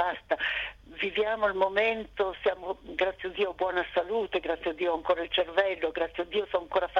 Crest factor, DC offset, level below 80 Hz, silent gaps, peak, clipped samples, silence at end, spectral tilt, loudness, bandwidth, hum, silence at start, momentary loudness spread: 20 dB; under 0.1%; -56 dBFS; none; -10 dBFS; under 0.1%; 0 s; -5 dB/octave; -29 LUFS; 7 kHz; none; 0 s; 6 LU